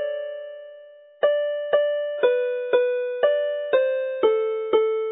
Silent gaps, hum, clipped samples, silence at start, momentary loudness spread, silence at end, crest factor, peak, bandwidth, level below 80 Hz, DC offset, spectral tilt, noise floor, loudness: none; none; under 0.1%; 0 s; 11 LU; 0 s; 16 dB; -6 dBFS; 4 kHz; -80 dBFS; under 0.1%; -7 dB/octave; -46 dBFS; -23 LUFS